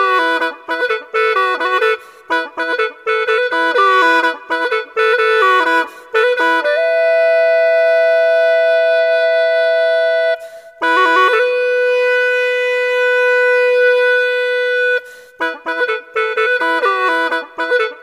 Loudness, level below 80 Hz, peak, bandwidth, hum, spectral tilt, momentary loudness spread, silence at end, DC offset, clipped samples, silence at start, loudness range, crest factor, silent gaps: -14 LUFS; -74 dBFS; 0 dBFS; 13 kHz; none; -0.5 dB/octave; 7 LU; 0 s; under 0.1%; under 0.1%; 0 s; 4 LU; 14 dB; none